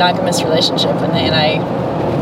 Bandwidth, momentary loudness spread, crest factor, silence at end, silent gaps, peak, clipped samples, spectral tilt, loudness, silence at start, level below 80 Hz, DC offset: 16.5 kHz; 5 LU; 14 dB; 0 s; none; 0 dBFS; under 0.1%; -5 dB/octave; -14 LUFS; 0 s; -44 dBFS; under 0.1%